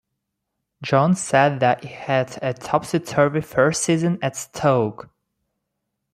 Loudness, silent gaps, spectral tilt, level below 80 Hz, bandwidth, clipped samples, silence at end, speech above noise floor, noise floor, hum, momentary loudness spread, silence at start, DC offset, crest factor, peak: -20 LUFS; none; -5.5 dB/octave; -60 dBFS; 15.5 kHz; under 0.1%; 1.1 s; 59 dB; -79 dBFS; none; 8 LU; 0.8 s; under 0.1%; 18 dB; -2 dBFS